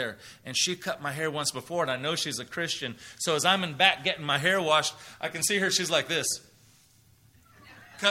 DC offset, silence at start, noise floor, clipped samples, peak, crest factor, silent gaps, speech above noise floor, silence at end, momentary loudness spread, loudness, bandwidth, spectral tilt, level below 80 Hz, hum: under 0.1%; 0 s; -60 dBFS; under 0.1%; -6 dBFS; 24 dB; none; 32 dB; 0 s; 10 LU; -27 LUFS; 16 kHz; -2 dB/octave; -68 dBFS; none